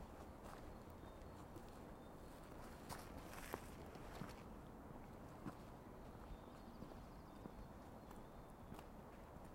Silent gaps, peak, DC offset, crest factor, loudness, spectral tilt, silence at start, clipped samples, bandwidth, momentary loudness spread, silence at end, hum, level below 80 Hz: none; -28 dBFS; under 0.1%; 28 dB; -57 LUFS; -5.5 dB/octave; 0 s; under 0.1%; 16 kHz; 5 LU; 0 s; none; -62 dBFS